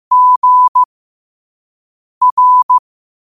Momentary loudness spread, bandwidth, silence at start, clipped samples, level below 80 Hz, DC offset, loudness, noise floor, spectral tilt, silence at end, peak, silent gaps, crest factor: 6 LU; 1.3 kHz; 0.1 s; under 0.1%; -66 dBFS; under 0.1%; -10 LUFS; under -90 dBFS; -1 dB/octave; 0.55 s; -4 dBFS; 0.36-0.42 s, 0.68-0.75 s, 0.85-2.21 s, 2.32-2.37 s, 2.63-2.69 s; 10 dB